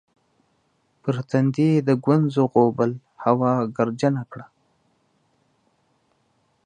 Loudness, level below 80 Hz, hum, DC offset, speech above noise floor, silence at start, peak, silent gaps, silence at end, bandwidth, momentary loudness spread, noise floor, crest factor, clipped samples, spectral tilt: -21 LUFS; -68 dBFS; none; under 0.1%; 47 dB; 1.05 s; -4 dBFS; none; 2.25 s; 9.6 kHz; 10 LU; -67 dBFS; 20 dB; under 0.1%; -8.5 dB/octave